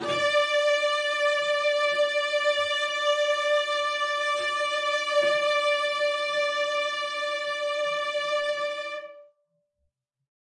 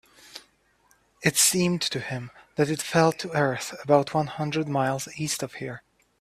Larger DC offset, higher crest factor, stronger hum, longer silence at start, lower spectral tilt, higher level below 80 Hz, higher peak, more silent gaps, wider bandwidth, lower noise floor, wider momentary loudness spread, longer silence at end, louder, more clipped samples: neither; second, 14 dB vs 22 dB; neither; second, 0 s vs 0.35 s; second, -0.5 dB/octave vs -3.5 dB/octave; second, -82 dBFS vs -64 dBFS; second, -12 dBFS vs -6 dBFS; neither; second, 11 kHz vs 16 kHz; first, -78 dBFS vs -64 dBFS; second, 5 LU vs 17 LU; first, 1.35 s vs 0.4 s; about the same, -25 LUFS vs -25 LUFS; neither